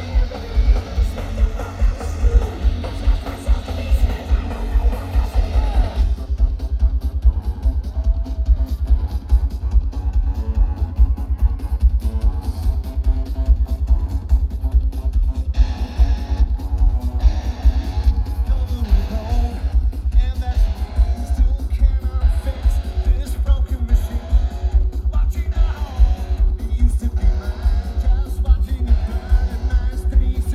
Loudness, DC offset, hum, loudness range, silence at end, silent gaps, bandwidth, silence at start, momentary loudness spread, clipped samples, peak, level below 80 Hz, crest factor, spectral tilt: -21 LUFS; under 0.1%; none; 1 LU; 0 s; none; 7 kHz; 0 s; 3 LU; under 0.1%; -2 dBFS; -18 dBFS; 14 dB; -7.5 dB/octave